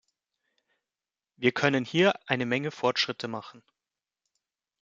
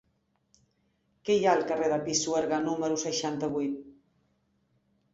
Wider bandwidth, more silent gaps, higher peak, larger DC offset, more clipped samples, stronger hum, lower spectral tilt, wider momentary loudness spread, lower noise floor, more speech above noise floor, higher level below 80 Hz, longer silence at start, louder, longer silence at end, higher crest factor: about the same, 7.8 kHz vs 8 kHz; neither; first, -6 dBFS vs -12 dBFS; neither; neither; neither; first, -5 dB/octave vs -3.5 dB/octave; about the same, 10 LU vs 8 LU; first, under -90 dBFS vs -74 dBFS; first, over 63 dB vs 46 dB; second, -74 dBFS vs -68 dBFS; first, 1.4 s vs 1.25 s; about the same, -27 LUFS vs -28 LUFS; about the same, 1.25 s vs 1.2 s; about the same, 24 dB vs 20 dB